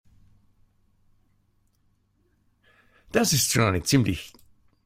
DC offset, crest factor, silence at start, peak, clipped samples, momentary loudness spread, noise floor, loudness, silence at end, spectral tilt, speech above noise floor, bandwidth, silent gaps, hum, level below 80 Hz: under 0.1%; 24 dB; 3.15 s; -4 dBFS; under 0.1%; 12 LU; -68 dBFS; -23 LUFS; 0.55 s; -4 dB/octave; 45 dB; 16 kHz; none; none; -52 dBFS